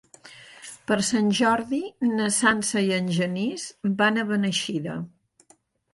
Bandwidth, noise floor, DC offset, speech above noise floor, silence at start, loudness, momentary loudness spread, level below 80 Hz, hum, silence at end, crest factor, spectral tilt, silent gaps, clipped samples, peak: 11.5 kHz; -61 dBFS; under 0.1%; 37 dB; 0.25 s; -24 LUFS; 15 LU; -64 dBFS; none; 0.85 s; 18 dB; -4 dB/octave; none; under 0.1%; -6 dBFS